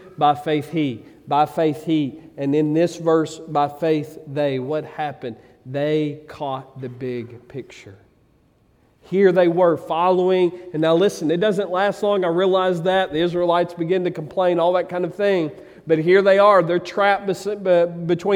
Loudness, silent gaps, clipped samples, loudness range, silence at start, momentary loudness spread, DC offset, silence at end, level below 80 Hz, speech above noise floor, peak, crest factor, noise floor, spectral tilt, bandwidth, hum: -20 LUFS; none; under 0.1%; 9 LU; 0.05 s; 13 LU; under 0.1%; 0 s; -62 dBFS; 39 dB; -2 dBFS; 18 dB; -58 dBFS; -6.5 dB/octave; 14.5 kHz; none